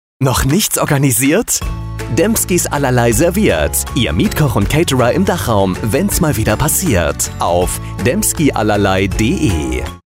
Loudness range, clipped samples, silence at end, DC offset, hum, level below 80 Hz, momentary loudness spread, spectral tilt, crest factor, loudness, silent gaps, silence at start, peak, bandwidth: 1 LU; under 0.1%; 0.1 s; under 0.1%; none; -26 dBFS; 4 LU; -4.5 dB/octave; 12 dB; -14 LUFS; none; 0.2 s; -2 dBFS; 16.5 kHz